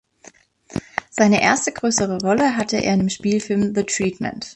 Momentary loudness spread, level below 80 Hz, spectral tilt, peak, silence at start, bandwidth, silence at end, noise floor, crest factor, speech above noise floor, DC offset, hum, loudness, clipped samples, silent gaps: 12 LU; -52 dBFS; -4 dB/octave; -2 dBFS; 0.7 s; 9.8 kHz; 0.05 s; -49 dBFS; 18 dB; 30 dB; under 0.1%; none; -19 LUFS; under 0.1%; none